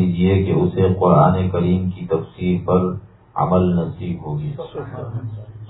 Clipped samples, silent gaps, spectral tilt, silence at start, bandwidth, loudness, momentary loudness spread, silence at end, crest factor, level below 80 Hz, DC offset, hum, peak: under 0.1%; none; -12.5 dB/octave; 0 s; 4.1 kHz; -19 LUFS; 16 LU; 0 s; 18 dB; -44 dBFS; under 0.1%; none; 0 dBFS